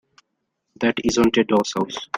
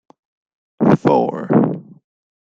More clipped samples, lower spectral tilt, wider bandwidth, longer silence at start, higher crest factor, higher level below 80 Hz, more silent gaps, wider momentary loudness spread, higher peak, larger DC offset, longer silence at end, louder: neither; second, -4.5 dB/octave vs -9.5 dB/octave; first, 16 kHz vs 7.4 kHz; about the same, 0.8 s vs 0.8 s; about the same, 18 dB vs 16 dB; about the same, -50 dBFS vs -54 dBFS; neither; about the same, 7 LU vs 7 LU; about the same, -4 dBFS vs -2 dBFS; neither; second, 0 s vs 0.6 s; second, -20 LUFS vs -16 LUFS